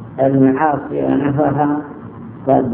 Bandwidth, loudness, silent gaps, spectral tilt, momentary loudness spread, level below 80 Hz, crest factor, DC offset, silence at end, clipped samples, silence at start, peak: 3.5 kHz; -16 LUFS; none; -12.5 dB/octave; 17 LU; -48 dBFS; 14 dB; under 0.1%; 0 s; under 0.1%; 0 s; 0 dBFS